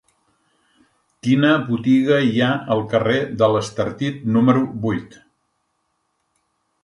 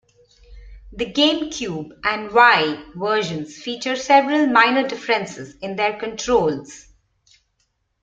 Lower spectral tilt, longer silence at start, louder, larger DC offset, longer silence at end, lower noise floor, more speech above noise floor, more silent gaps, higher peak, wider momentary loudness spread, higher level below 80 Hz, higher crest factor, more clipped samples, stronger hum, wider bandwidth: first, -7 dB/octave vs -3.5 dB/octave; first, 1.25 s vs 0.5 s; about the same, -19 LUFS vs -19 LUFS; neither; first, 1.75 s vs 1.2 s; about the same, -71 dBFS vs -69 dBFS; about the same, 53 dB vs 50 dB; neither; about the same, -2 dBFS vs -2 dBFS; second, 9 LU vs 15 LU; second, -56 dBFS vs -50 dBFS; about the same, 18 dB vs 20 dB; neither; neither; first, 11 kHz vs 9 kHz